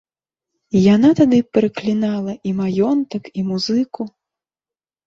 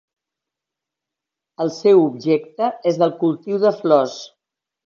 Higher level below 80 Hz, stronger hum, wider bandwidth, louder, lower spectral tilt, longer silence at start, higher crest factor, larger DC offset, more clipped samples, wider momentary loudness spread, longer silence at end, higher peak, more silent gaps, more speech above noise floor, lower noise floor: first, -56 dBFS vs -74 dBFS; neither; about the same, 7.6 kHz vs 7.2 kHz; about the same, -17 LUFS vs -18 LUFS; about the same, -7 dB/octave vs -6.5 dB/octave; second, 0.75 s vs 1.6 s; about the same, 16 dB vs 18 dB; neither; neither; about the same, 12 LU vs 11 LU; first, 1 s vs 0.6 s; about the same, -2 dBFS vs -2 dBFS; neither; first, over 74 dB vs 68 dB; first, under -90 dBFS vs -85 dBFS